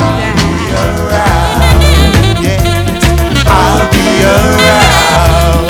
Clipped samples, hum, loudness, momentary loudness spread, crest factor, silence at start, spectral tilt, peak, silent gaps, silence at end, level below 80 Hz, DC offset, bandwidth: 2%; none; -8 LUFS; 5 LU; 8 dB; 0 s; -5 dB/octave; 0 dBFS; none; 0 s; -14 dBFS; under 0.1%; over 20 kHz